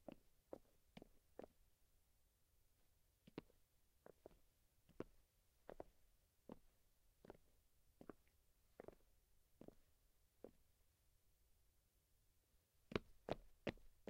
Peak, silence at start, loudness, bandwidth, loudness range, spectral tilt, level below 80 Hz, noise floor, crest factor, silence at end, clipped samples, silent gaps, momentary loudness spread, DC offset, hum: -26 dBFS; 0 s; -59 LUFS; 15.5 kHz; 10 LU; -6 dB/octave; -74 dBFS; -80 dBFS; 36 dB; 0 s; under 0.1%; none; 16 LU; under 0.1%; none